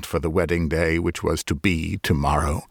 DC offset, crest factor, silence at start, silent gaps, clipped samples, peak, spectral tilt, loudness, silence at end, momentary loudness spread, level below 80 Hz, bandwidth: under 0.1%; 16 dB; 0 s; none; under 0.1%; -6 dBFS; -5.5 dB/octave; -23 LUFS; 0.05 s; 3 LU; -32 dBFS; 19 kHz